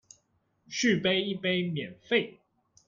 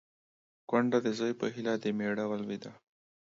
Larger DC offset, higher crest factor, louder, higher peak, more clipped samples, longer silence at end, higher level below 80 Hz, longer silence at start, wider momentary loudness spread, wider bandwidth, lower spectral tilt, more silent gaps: neither; about the same, 20 dB vs 20 dB; first, -28 LUFS vs -33 LUFS; about the same, -12 dBFS vs -14 dBFS; neither; about the same, 0.55 s vs 0.5 s; first, -70 dBFS vs -78 dBFS; about the same, 0.7 s vs 0.7 s; about the same, 12 LU vs 11 LU; about the same, 7.4 kHz vs 7.6 kHz; second, -4.5 dB/octave vs -6 dB/octave; neither